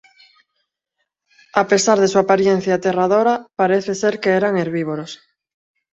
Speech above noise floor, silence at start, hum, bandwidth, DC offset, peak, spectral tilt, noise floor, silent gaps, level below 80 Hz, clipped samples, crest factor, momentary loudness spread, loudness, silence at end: 58 dB; 1.55 s; none; 8.2 kHz; under 0.1%; 0 dBFS; -4.5 dB/octave; -75 dBFS; none; -62 dBFS; under 0.1%; 18 dB; 9 LU; -17 LUFS; 0.75 s